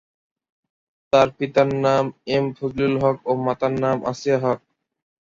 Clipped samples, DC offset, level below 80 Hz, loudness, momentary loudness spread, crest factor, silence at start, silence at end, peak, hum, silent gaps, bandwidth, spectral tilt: under 0.1%; under 0.1%; -54 dBFS; -21 LUFS; 5 LU; 20 dB; 1.15 s; 0.65 s; -2 dBFS; none; none; 7.6 kHz; -6.5 dB/octave